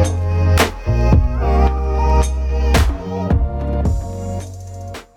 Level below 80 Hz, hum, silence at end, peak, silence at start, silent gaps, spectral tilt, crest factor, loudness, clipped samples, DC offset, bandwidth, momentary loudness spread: -18 dBFS; none; 0.15 s; -2 dBFS; 0 s; none; -6 dB/octave; 14 dB; -17 LUFS; under 0.1%; under 0.1%; 16 kHz; 12 LU